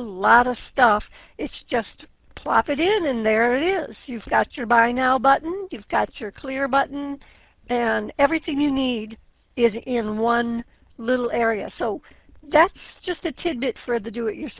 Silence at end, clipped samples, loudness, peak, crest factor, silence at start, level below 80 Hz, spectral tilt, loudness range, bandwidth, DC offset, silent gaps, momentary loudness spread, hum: 0.1 s; under 0.1%; -22 LUFS; -2 dBFS; 20 dB; 0 s; -50 dBFS; -8.5 dB/octave; 3 LU; 4 kHz; under 0.1%; none; 15 LU; none